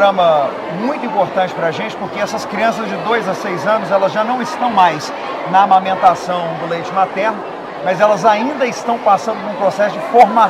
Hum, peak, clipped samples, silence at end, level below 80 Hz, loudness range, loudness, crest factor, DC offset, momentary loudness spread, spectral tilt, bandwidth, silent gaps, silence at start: none; 0 dBFS; 0.2%; 0 s; -60 dBFS; 3 LU; -15 LUFS; 14 dB; under 0.1%; 10 LU; -5 dB/octave; 14 kHz; none; 0 s